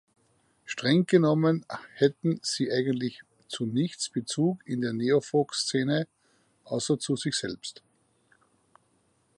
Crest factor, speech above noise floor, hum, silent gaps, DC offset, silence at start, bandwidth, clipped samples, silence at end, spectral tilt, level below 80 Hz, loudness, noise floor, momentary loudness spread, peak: 20 dB; 42 dB; none; none; under 0.1%; 0.65 s; 11.5 kHz; under 0.1%; 1.65 s; -5 dB/octave; -72 dBFS; -27 LUFS; -69 dBFS; 13 LU; -8 dBFS